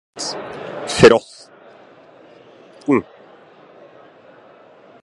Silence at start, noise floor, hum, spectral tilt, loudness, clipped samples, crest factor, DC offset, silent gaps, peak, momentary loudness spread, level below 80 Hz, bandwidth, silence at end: 0.15 s; -46 dBFS; none; -4.5 dB/octave; -17 LUFS; under 0.1%; 22 dB; under 0.1%; none; 0 dBFS; 19 LU; -48 dBFS; 11.5 kHz; 2 s